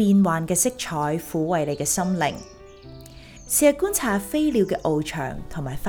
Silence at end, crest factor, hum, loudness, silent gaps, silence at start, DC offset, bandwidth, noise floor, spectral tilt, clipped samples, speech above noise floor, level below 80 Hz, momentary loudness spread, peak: 0 s; 20 dB; none; -23 LUFS; none; 0 s; under 0.1%; over 20 kHz; -43 dBFS; -4.5 dB/octave; under 0.1%; 21 dB; -46 dBFS; 14 LU; -4 dBFS